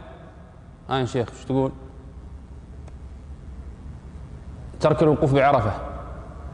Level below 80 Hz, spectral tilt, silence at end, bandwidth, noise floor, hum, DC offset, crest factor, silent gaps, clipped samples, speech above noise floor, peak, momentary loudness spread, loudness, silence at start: -40 dBFS; -7.5 dB/octave; 0 s; 10 kHz; -44 dBFS; none; under 0.1%; 18 dB; none; under 0.1%; 24 dB; -8 dBFS; 24 LU; -22 LUFS; 0 s